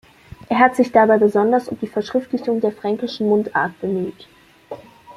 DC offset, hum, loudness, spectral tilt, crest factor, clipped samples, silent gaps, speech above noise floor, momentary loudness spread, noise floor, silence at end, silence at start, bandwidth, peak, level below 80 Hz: under 0.1%; none; -18 LUFS; -6.5 dB/octave; 18 dB; under 0.1%; none; 20 dB; 15 LU; -38 dBFS; 0.05 s; 0.5 s; 13 kHz; -2 dBFS; -58 dBFS